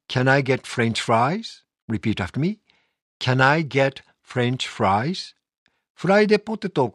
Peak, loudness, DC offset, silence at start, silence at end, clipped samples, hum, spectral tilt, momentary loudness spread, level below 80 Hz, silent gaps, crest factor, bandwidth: -2 dBFS; -22 LUFS; under 0.1%; 0.1 s; 0.05 s; under 0.1%; none; -6 dB/octave; 12 LU; -58 dBFS; 1.82-1.88 s, 3.02-3.20 s, 5.58-5.66 s, 5.90-5.95 s; 20 dB; 11.5 kHz